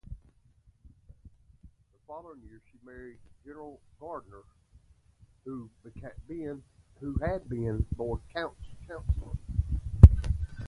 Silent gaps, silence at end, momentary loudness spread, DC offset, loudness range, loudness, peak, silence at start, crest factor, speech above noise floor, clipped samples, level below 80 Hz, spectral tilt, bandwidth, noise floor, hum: none; 0 s; 23 LU; under 0.1%; 25 LU; -27 LUFS; 0 dBFS; 0.1 s; 30 dB; 26 dB; under 0.1%; -32 dBFS; -9.5 dB/octave; 5 kHz; -63 dBFS; none